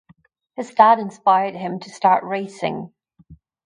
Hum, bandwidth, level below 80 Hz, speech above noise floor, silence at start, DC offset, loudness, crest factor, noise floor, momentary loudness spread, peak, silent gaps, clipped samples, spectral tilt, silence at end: none; 10.5 kHz; -62 dBFS; 37 dB; 0.6 s; under 0.1%; -19 LUFS; 20 dB; -56 dBFS; 18 LU; 0 dBFS; none; under 0.1%; -5.5 dB/octave; 0.3 s